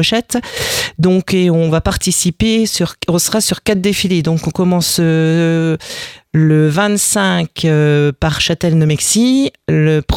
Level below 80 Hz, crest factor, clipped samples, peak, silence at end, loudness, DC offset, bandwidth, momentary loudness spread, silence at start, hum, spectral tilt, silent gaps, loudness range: -36 dBFS; 14 dB; under 0.1%; 0 dBFS; 0 s; -13 LUFS; under 0.1%; 18 kHz; 5 LU; 0 s; none; -4.5 dB/octave; none; 1 LU